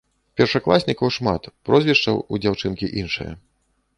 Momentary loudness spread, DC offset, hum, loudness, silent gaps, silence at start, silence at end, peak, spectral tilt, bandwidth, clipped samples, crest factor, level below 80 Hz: 11 LU; under 0.1%; none; -20 LUFS; none; 0.35 s; 0.6 s; -2 dBFS; -6 dB/octave; 11 kHz; under 0.1%; 20 dB; -46 dBFS